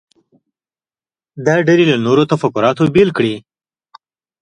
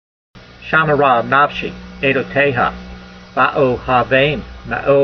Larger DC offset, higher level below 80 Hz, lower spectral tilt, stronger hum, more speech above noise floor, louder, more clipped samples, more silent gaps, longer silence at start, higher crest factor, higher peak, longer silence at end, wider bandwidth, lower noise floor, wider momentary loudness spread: neither; second, -52 dBFS vs -40 dBFS; about the same, -6.5 dB/octave vs -7 dB/octave; neither; first, over 77 dB vs 21 dB; about the same, -13 LUFS vs -15 LUFS; neither; neither; first, 1.35 s vs 0.35 s; about the same, 16 dB vs 16 dB; about the same, 0 dBFS vs 0 dBFS; first, 1 s vs 0 s; first, 9.8 kHz vs 6.4 kHz; first, under -90 dBFS vs -35 dBFS; second, 8 LU vs 13 LU